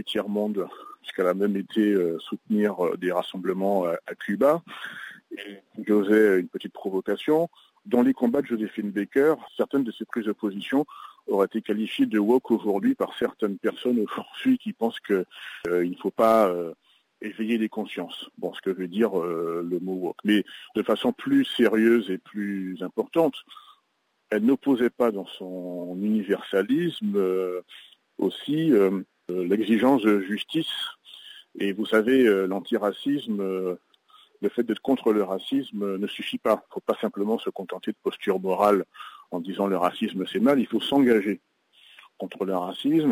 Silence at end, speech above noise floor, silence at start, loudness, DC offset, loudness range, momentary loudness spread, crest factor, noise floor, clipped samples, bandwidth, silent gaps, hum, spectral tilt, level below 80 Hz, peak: 0 s; 48 dB; 0 s; -25 LUFS; under 0.1%; 3 LU; 13 LU; 18 dB; -72 dBFS; under 0.1%; 16 kHz; none; none; -6.5 dB/octave; -72 dBFS; -8 dBFS